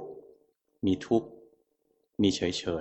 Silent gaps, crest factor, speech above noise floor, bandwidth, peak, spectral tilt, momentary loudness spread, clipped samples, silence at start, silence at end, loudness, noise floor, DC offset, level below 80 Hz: none; 20 dB; 46 dB; 8.4 kHz; -12 dBFS; -5.5 dB/octave; 20 LU; under 0.1%; 0 s; 0 s; -29 LUFS; -74 dBFS; under 0.1%; -60 dBFS